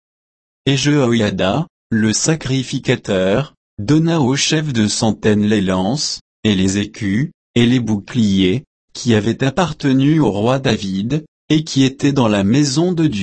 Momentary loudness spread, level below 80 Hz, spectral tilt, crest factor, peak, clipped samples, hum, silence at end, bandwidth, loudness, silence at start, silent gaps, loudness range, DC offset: 6 LU; -46 dBFS; -5 dB/octave; 14 dB; -2 dBFS; under 0.1%; none; 0 s; 8.8 kHz; -16 LUFS; 0.65 s; 1.70-1.90 s, 3.57-3.77 s, 6.21-6.43 s, 7.34-7.54 s, 8.67-8.88 s, 11.28-11.48 s; 1 LU; under 0.1%